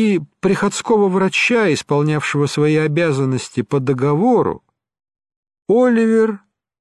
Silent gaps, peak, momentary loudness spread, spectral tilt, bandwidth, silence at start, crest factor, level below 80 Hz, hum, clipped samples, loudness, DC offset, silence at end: 5.36-5.43 s; -4 dBFS; 6 LU; -6 dB/octave; 12 kHz; 0 s; 12 dB; -56 dBFS; none; under 0.1%; -16 LUFS; under 0.1%; 0.45 s